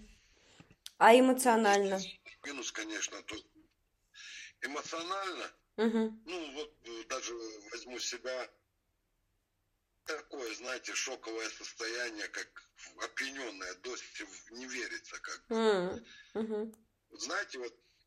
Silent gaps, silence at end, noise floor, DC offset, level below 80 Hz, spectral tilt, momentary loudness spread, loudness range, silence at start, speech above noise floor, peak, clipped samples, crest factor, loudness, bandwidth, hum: none; 0.35 s; -80 dBFS; under 0.1%; -74 dBFS; -2.5 dB/octave; 19 LU; 13 LU; 0 s; 46 dB; -8 dBFS; under 0.1%; 26 dB; -34 LUFS; 14.5 kHz; none